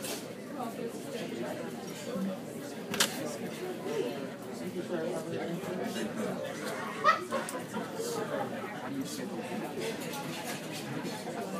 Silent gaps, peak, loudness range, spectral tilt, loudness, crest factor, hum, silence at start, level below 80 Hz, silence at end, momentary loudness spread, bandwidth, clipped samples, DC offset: none; -10 dBFS; 3 LU; -4 dB/octave; -36 LUFS; 26 dB; none; 0 s; -76 dBFS; 0 s; 9 LU; 15.5 kHz; under 0.1%; under 0.1%